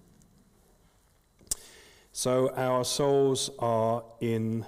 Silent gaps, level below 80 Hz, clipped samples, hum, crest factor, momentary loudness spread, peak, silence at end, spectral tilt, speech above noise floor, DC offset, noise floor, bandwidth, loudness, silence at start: none; -60 dBFS; under 0.1%; none; 16 dB; 10 LU; -14 dBFS; 0 s; -4.5 dB/octave; 38 dB; under 0.1%; -65 dBFS; 16 kHz; -28 LUFS; 1.5 s